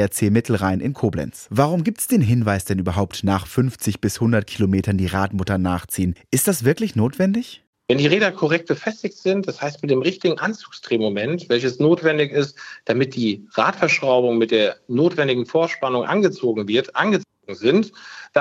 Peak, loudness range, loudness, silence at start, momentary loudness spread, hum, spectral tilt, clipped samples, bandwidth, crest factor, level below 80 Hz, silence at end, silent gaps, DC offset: -2 dBFS; 2 LU; -20 LUFS; 0 s; 7 LU; none; -5.5 dB/octave; under 0.1%; 16 kHz; 18 dB; -54 dBFS; 0 s; 7.67-7.73 s; under 0.1%